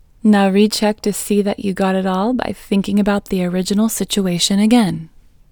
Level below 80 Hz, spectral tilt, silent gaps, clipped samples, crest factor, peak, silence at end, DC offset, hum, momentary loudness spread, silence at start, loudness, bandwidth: -44 dBFS; -5 dB/octave; none; under 0.1%; 16 dB; 0 dBFS; 0.45 s; under 0.1%; none; 7 LU; 0.25 s; -16 LUFS; over 20 kHz